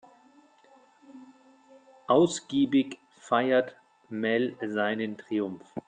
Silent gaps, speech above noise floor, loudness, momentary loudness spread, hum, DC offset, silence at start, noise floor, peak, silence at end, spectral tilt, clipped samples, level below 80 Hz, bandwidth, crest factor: none; 33 dB; -27 LUFS; 14 LU; none; under 0.1%; 1.15 s; -59 dBFS; -10 dBFS; 0.05 s; -5 dB/octave; under 0.1%; -74 dBFS; 9.4 kHz; 20 dB